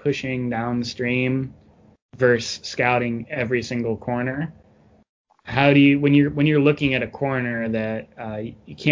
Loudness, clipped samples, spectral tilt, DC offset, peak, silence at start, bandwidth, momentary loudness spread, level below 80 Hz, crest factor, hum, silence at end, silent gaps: -21 LUFS; under 0.1%; -6.5 dB/octave; under 0.1%; -2 dBFS; 0.05 s; 7.6 kHz; 14 LU; -52 dBFS; 20 dB; none; 0 s; 2.02-2.09 s, 5.09-5.25 s